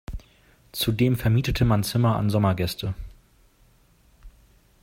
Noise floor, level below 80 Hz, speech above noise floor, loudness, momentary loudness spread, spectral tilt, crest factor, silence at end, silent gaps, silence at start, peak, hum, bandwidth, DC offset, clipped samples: -59 dBFS; -40 dBFS; 37 dB; -23 LUFS; 17 LU; -6.5 dB/octave; 18 dB; 0.55 s; none; 0.1 s; -8 dBFS; none; 16 kHz; under 0.1%; under 0.1%